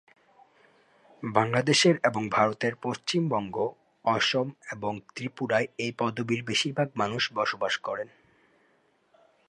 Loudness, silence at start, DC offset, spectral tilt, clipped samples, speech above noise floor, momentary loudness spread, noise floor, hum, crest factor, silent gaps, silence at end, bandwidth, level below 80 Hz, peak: -27 LUFS; 1.2 s; under 0.1%; -4 dB/octave; under 0.1%; 40 dB; 12 LU; -67 dBFS; none; 24 dB; none; 1.45 s; 11.5 kHz; -68 dBFS; -6 dBFS